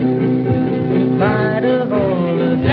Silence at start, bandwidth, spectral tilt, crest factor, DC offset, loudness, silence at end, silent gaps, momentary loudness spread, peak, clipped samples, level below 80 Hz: 0 s; 5 kHz; -11 dB/octave; 12 dB; under 0.1%; -16 LUFS; 0 s; none; 2 LU; -2 dBFS; under 0.1%; -44 dBFS